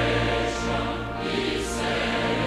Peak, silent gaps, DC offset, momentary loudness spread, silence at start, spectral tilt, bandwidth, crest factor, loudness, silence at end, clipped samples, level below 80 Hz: -12 dBFS; none; under 0.1%; 4 LU; 0 s; -4.5 dB/octave; 14 kHz; 14 dB; -26 LUFS; 0 s; under 0.1%; -38 dBFS